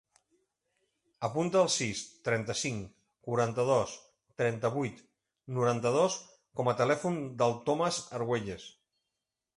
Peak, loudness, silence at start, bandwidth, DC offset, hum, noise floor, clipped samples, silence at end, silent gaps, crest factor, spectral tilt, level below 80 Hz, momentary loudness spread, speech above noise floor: -14 dBFS; -31 LUFS; 1.2 s; 11.5 kHz; under 0.1%; none; -88 dBFS; under 0.1%; 0.85 s; none; 18 dB; -4.5 dB/octave; -66 dBFS; 14 LU; 57 dB